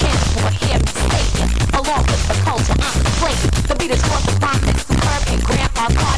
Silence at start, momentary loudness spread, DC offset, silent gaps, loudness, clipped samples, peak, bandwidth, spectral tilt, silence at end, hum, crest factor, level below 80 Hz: 0 s; 1 LU; 3%; none; -17 LUFS; under 0.1%; -4 dBFS; 11 kHz; -4.5 dB/octave; 0 s; none; 12 dB; -20 dBFS